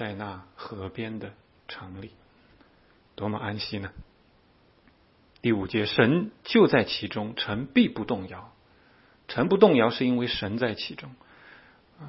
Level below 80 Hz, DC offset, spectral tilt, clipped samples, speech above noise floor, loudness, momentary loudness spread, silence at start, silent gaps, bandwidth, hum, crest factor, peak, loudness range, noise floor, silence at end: -58 dBFS; under 0.1%; -9.5 dB/octave; under 0.1%; 35 dB; -26 LUFS; 22 LU; 0 s; none; 5.8 kHz; none; 24 dB; -2 dBFS; 13 LU; -61 dBFS; 0 s